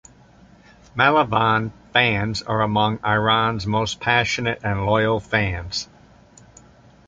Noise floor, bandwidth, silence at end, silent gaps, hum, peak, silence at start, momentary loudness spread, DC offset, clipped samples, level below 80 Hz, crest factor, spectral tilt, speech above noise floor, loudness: -50 dBFS; 7.8 kHz; 1.25 s; none; none; -2 dBFS; 0.95 s; 7 LU; under 0.1%; under 0.1%; -44 dBFS; 20 dB; -5 dB/octave; 30 dB; -20 LUFS